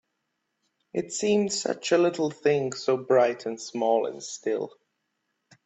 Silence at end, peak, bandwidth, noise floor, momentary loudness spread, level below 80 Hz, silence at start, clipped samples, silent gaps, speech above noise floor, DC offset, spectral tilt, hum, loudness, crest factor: 0.95 s; -8 dBFS; 8.4 kHz; -79 dBFS; 11 LU; -72 dBFS; 0.95 s; under 0.1%; none; 54 dB; under 0.1%; -4 dB/octave; none; -26 LUFS; 18 dB